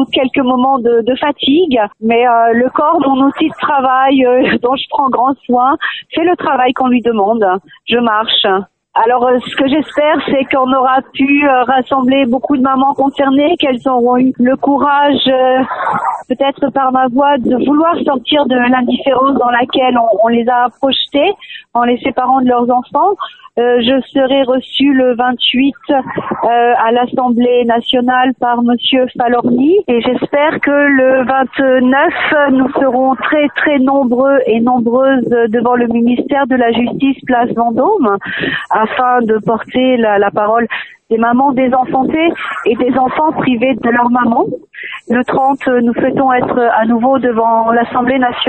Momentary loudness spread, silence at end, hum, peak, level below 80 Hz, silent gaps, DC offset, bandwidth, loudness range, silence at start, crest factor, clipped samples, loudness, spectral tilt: 4 LU; 0 s; none; 0 dBFS; -50 dBFS; none; under 0.1%; 4.3 kHz; 2 LU; 0 s; 12 dB; under 0.1%; -11 LUFS; -7 dB/octave